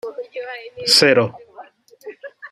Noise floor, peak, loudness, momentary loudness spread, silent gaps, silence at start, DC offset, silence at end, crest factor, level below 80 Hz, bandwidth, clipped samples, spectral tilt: -43 dBFS; -2 dBFS; -14 LUFS; 25 LU; none; 0.05 s; under 0.1%; 0.05 s; 20 dB; -66 dBFS; 15.5 kHz; under 0.1%; -2.5 dB/octave